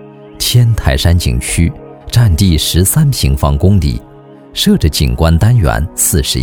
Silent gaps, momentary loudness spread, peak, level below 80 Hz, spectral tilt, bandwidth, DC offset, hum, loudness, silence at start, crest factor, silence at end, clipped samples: none; 6 LU; 0 dBFS; -18 dBFS; -5 dB/octave; 18.5 kHz; under 0.1%; none; -11 LUFS; 0 s; 10 dB; 0 s; under 0.1%